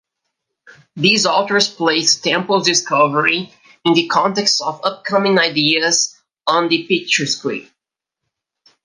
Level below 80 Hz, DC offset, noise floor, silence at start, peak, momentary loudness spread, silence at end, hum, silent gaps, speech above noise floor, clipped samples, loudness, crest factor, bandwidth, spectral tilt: -68 dBFS; under 0.1%; -82 dBFS; 0.95 s; 0 dBFS; 8 LU; 1.2 s; none; none; 66 dB; under 0.1%; -15 LUFS; 18 dB; 11 kHz; -2.5 dB/octave